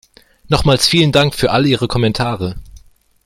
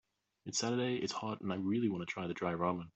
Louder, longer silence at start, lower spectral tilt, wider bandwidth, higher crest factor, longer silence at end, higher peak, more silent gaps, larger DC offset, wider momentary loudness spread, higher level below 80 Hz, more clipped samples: first, -14 LUFS vs -37 LUFS; about the same, 0.5 s vs 0.45 s; about the same, -5 dB/octave vs -4.5 dB/octave; first, 16 kHz vs 8.2 kHz; about the same, 16 dB vs 18 dB; first, 0.5 s vs 0.05 s; first, 0 dBFS vs -20 dBFS; neither; neither; first, 11 LU vs 5 LU; first, -34 dBFS vs -74 dBFS; neither